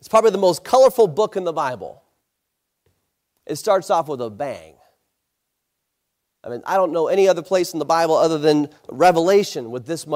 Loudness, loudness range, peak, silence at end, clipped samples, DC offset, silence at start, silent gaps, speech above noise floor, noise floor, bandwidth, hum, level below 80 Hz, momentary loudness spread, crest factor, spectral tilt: -18 LUFS; 8 LU; -4 dBFS; 0 s; under 0.1%; under 0.1%; 0.05 s; none; 59 dB; -77 dBFS; 16 kHz; none; -64 dBFS; 15 LU; 16 dB; -5 dB/octave